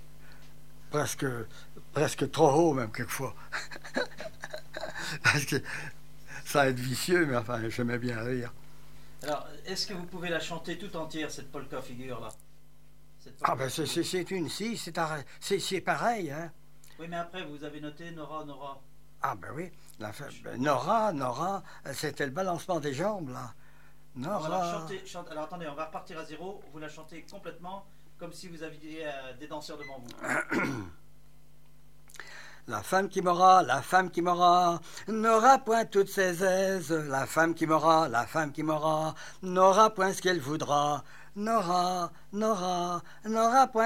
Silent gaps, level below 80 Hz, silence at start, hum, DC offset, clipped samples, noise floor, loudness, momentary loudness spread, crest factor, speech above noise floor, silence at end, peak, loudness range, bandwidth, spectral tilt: none; -62 dBFS; 0 s; none; 0.5%; under 0.1%; -60 dBFS; -29 LUFS; 20 LU; 22 dB; 31 dB; 0 s; -8 dBFS; 14 LU; 16 kHz; -4.5 dB/octave